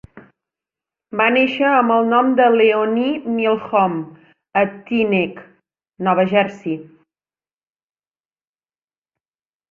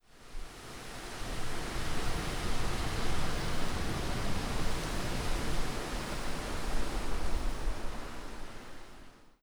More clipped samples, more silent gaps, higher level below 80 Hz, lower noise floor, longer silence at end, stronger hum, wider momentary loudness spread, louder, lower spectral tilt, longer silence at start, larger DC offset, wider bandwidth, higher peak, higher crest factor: neither; neither; second, -62 dBFS vs -38 dBFS; first, under -90 dBFS vs -52 dBFS; first, 2.9 s vs 0.1 s; neither; about the same, 13 LU vs 12 LU; first, -17 LUFS vs -38 LUFS; first, -7.5 dB/octave vs -4 dB/octave; about the same, 0.15 s vs 0.15 s; neither; second, 7 kHz vs 16 kHz; first, -2 dBFS vs -18 dBFS; about the same, 18 dB vs 14 dB